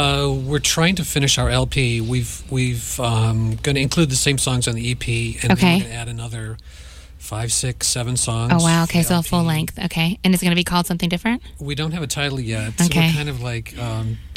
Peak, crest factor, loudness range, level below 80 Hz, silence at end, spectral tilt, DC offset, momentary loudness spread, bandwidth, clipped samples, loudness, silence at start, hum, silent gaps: 0 dBFS; 18 dB; 3 LU; -36 dBFS; 0 s; -4 dB/octave; under 0.1%; 11 LU; 16.5 kHz; under 0.1%; -19 LUFS; 0 s; none; none